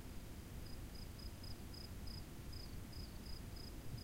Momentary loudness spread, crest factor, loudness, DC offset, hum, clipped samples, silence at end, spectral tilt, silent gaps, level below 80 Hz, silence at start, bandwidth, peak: 2 LU; 14 dB; -52 LUFS; under 0.1%; none; under 0.1%; 0 s; -5 dB/octave; none; -54 dBFS; 0 s; 16 kHz; -36 dBFS